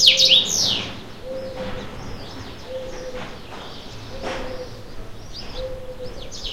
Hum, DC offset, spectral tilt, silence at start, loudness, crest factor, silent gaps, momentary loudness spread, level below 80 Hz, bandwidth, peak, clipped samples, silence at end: none; 1%; -1 dB/octave; 0 s; -20 LUFS; 24 dB; none; 22 LU; -40 dBFS; 16 kHz; 0 dBFS; under 0.1%; 0 s